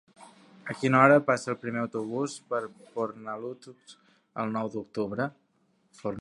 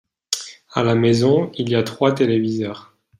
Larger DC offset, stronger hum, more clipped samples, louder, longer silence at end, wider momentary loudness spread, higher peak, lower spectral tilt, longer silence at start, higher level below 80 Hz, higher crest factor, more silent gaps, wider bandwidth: neither; neither; neither; second, -28 LUFS vs -19 LUFS; second, 0 s vs 0.35 s; first, 19 LU vs 10 LU; second, -4 dBFS vs 0 dBFS; about the same, -6.5 dB/octave vs -5.5 dB/octave; about the same, 0.2 s vs 0.3 s; second, -72 dBFS vs -58 dBFS; first, 24 dB vs 18 dB; neither; second, 11.5 kHz vs 15.5 kHz